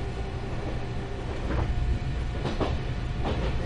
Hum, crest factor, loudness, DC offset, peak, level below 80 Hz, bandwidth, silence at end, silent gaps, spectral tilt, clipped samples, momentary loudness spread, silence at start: none; 16 dB; -31 LUFS; under 0.1%; -12 dBFS; -32 dBFS; 10 kHz; 0 s; none; -7 dB/octave; under 0.1%; 5 LU; 0 s